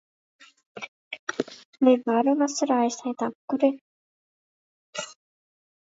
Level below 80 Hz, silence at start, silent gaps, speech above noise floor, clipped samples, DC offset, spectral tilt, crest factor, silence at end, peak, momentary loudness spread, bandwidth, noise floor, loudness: -82 dBFS; 0.75 s; 0.88-1.11 s, 1.19-1.27 s, 1.65-1.73 s, 3.35-3.48 s, 3.81-4.93 s; over 67 dB; under 0.1%; under 0.1%; -3.5 dB/octave; 20 dB; 0.85 s; -8 dBFS; 19 LU; 8 kHz; under -90 dBFS; -25 LUFS